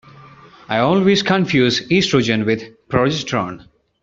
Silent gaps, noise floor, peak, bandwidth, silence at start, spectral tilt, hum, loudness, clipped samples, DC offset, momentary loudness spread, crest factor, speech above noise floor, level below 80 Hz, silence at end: none; -43 dBFS; -2 dBFS; 7.6 kHz; 0.7 s; -4 dB/octave; none; -17 LUFS; under 0.1%; under 0.1%; 8 LU; 16 dB; 26 dB; -50 dBFS; 0.45 s